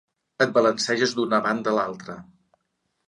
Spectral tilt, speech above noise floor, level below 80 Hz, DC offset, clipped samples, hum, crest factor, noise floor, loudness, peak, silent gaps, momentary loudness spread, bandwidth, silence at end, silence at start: -4 dB/octave; 53 dB; -70 dBFS; under 0.1%; under 0.1%; none; 18 dB; -75 dBFS; -23 LUFS; -6 dBFS; none; 17 LU; 11 kHz; 0.85 s; 0.4 s